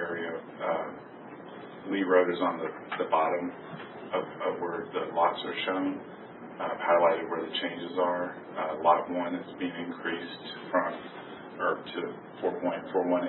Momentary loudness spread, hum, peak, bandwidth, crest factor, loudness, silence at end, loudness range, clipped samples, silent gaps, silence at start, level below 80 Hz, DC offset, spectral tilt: 17 LU; none; -10 dBFS; 4.2 kHz; 20 dB; -30 LUFS; 0 s; 4 LU; under 0.1%; none; 0 s; -76 dBFS; under 0.1%; -2.5 dB/octave